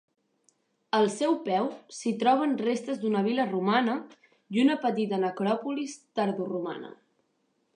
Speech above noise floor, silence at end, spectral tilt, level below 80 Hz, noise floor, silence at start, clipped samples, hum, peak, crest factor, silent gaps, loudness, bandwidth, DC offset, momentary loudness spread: 46 dB; 0.8 s; -5.5 dB/octave; -84 dBFS; -74 dBFS; 0.95 s; under 0.1%; none; -10 dBFS; 18 dB; none; -28 LUFS; 10.5 kHz; under 0.1%; 9 LU